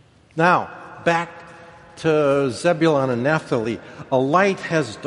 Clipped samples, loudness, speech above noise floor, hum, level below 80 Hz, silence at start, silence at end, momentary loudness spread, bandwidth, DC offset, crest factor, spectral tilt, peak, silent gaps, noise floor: under 0.1%; -20 LUFS; 24 dB; none; -58 dBFS; 0.35 s; 0 s; 13 LU; 11.5 kHz; under 0.1%; 20 dB; -6 dB/octave; -2 dBFS; none; -43 dBFS